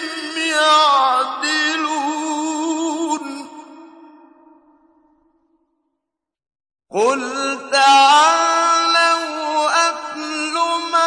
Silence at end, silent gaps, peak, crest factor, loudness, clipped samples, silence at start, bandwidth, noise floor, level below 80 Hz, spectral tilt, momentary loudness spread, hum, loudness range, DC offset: 0 s; none; -2 dBFS; 16 dB; -16 LUFS; under 0.1%; 0 s; 10.5 kHz; -79 dBFS; -74 dBFS; -0.5 dB/octave; 12 LU; none; 13 LU; under 0.1%